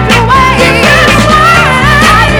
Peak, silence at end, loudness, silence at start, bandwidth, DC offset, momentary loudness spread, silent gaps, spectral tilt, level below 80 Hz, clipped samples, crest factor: 0 dBFS; 0 s; -4 LUFS; 0 s; over 20 kHz; under 0.1%; 1 LU; none; -4.5 dB/octave; -18 dBFS; 6%; 4 dB